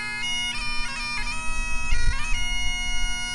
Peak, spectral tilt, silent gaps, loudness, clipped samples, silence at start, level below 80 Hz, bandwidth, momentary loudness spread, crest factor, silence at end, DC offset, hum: -8 dBFS; -1 dB/octave; none; -27 LUFS; under 0.1%; 0 s; -28 dBFS; 11.5 kHz; 3 LU; 14 dB; 0 s; under 0.1%; none